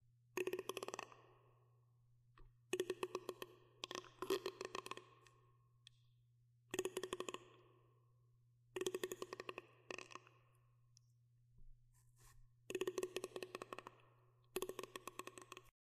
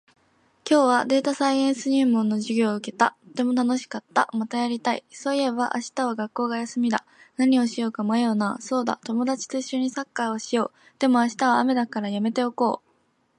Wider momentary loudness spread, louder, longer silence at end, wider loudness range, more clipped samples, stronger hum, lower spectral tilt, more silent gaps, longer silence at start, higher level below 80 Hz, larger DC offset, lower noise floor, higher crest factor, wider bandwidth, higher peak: first, 22 LU vs 7 LU; second, -49 LUFS vs -24 LUFS; second, 0.2 s vs 0.6 s; about the same, 4 LU vs 3 LU; neither; neither; second, -3 dB/octave vs -4.5 dB/octave; neither; second, 0.35 s vs 0.65 s; about the same, -76 dBFS vs -76 dBFS; neither; first, -74 dBFS vs -66 dBFS; first, 26 dB vs 20 dB; first, 15 kHz vs 11 kHz; second, -26 dBFS vs -4 dBFS